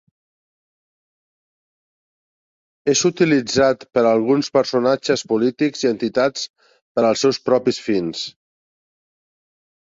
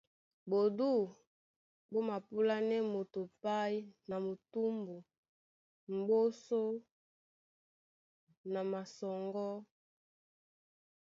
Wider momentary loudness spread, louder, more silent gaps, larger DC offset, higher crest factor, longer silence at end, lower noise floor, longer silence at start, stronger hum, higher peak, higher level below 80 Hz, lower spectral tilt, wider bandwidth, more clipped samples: about the same, 10 LU vs 11 LU; first, -19 LUFS vs -37 LUFS; second, 6.50-6.54 s, 6.82-6.95 s vs 1.27-1.89 s, 5.18-5.23 s, 5.29-5.87 s, 6.91-8.27 s, 8.37-8.44 s; neither; about the same, 18 dB vs 16 dB; first, 1.7 s vs 1.35 s; about the same, under -90 dBFS vs under -90 dBFS; first, 2.85 s vs 0.45 s; neither; first, -2 dBFS vs -22 dBFS; first, -60 dBFS vs -86 dBFS; second, -4 dB/octave vs -5.5 dB/octave; about the same, 7.8 kHz vs 7.4 kHz; neither